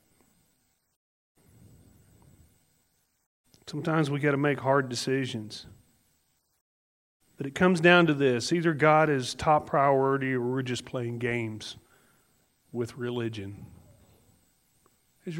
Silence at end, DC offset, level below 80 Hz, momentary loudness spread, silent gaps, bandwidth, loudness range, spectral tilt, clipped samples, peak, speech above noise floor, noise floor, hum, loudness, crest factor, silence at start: 0 s; under 0.1%; -64 dBFS; 19 LU; 6.61-7.20 s; 16 kHz; 14 LU; -5.5 dB/octave; under 0.1%; -4 dBFS; 46 dB; -72 dBFS; none; -26 LUFS; 24 dB; 3.65 s